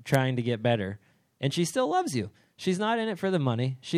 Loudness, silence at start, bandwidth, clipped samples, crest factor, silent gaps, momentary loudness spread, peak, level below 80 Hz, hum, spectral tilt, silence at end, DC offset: -28 LUFS; 0 s; 15 kHz; under 0.1%; 20 dB; none; 8 LU; -8 dBFS; -70 dBFS; none; -5.5 dB/octave; 0 s; under 0.1%